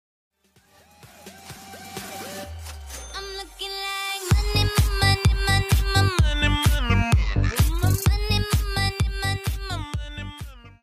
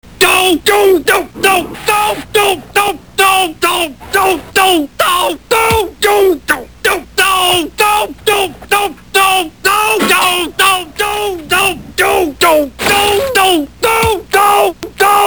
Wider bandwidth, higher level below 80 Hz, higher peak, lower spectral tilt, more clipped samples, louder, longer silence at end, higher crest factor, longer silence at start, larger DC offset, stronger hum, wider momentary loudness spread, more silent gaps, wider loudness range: second, 15.5 kHz vs over 20 kHz; first, -28 dBFS vs -38 dBFS; second, -6 dBFS vs 0 dBFS; first, -4.5 dB/octave vs -2 dB/octave; neither; second, -23 LUFS vs -11 LUFS; first, 0.15 s vs 0 s; first, 18 dB vs 12 dB; first, 1.05 s vs 0.05 s; second, under 0.1% vs 0.6%; neither; first, 17 LU vs 5 LU; neither; first, 14 LU vs 1 LU